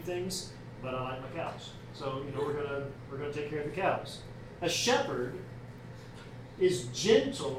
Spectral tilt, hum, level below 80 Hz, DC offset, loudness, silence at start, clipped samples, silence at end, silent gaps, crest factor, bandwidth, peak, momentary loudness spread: -4 dB/octave; none; -58 dBFS; under 0.1%; -33 LUFS; 0 s; under 0.1%; 0 s; none; 22 dB; 16 kHz; -12 dBFS; 20 LU